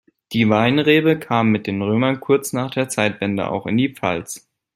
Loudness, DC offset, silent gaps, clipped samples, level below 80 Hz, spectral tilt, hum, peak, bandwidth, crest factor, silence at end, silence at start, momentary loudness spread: -19 LUFS; under 0.1%; none; under 0.1%; -58 dBFS; -5.5 dB/octave; none; -2 dBFS; 16 kHz; 18 dB; 0.4 s; 0.3 s; 8 LU